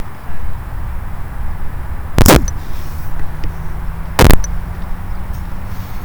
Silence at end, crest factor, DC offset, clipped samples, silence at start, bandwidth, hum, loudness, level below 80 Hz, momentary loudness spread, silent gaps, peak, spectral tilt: 0 s; 14 dB; under 0.1%; under 0.1%; 0 s; over 20 kHz; none; -18 LUFS; -20 dBFS; 17 LU; none; 0 dBFS; -5 dB/octave